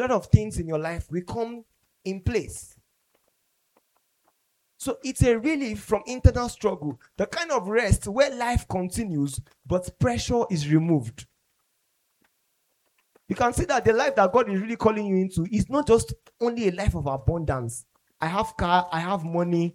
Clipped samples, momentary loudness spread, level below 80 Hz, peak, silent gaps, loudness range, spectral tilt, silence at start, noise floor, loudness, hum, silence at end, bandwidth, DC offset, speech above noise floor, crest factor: under 0.1%; 11 LU; -38 dBFS; -2 dBFS; none; 9 LU; -6 dB/octave; 0 s; -72 dBFS; -25 LUFS; none; 0 s; 15.5 kHz; under 0.1%; 48 dB; 24 dB